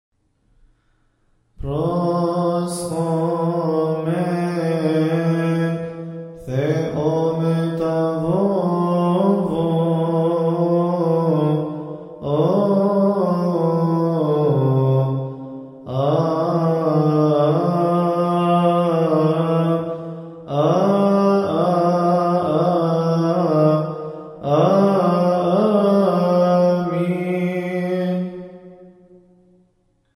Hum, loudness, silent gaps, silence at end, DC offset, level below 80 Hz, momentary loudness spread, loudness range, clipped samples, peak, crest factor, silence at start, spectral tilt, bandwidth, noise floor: none; -19 LUFS; none; 1.3 s; under 0.1%; -52 dBFS; 10 LU; 4 LU; under 0.1%; -4 dBFS; 16 dB; 1.6 s; -8.5 dB/octave; 12 kHz; -63 dBFS